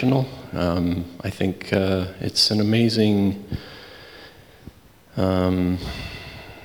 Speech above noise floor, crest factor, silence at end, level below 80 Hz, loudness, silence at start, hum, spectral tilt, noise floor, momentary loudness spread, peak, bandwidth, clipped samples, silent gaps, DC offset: 25 dB; 18 dB; 0 s; -46 dBFS; -22 LUFS; 0 s; none; -6 dB/octave; -46 dBFS; 21 LU; -6 dBFS; over 20 kHz; under 0.1%; none; under 0.1%